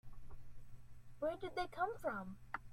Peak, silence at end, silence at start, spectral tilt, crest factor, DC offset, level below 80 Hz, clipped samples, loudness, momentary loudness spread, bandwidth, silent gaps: -28 dBFS; 0 s; 0.05 s; -6 dB/octave; 18 dB; under 0.1%; -60 dBFS; under 0.1%; -44 LUFS; 22 LU; 16 kHz; none